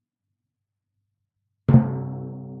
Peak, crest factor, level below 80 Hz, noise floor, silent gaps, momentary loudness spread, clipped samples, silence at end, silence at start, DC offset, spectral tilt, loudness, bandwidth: -2 dBFS; 22 dB; -52 dBFS; -83 dBFS; none; 16 LU; under 0.1%; 0 s; 1.7 s; under 0.1%; -13 dB/octave; -21 LUFS; 3.2 kHz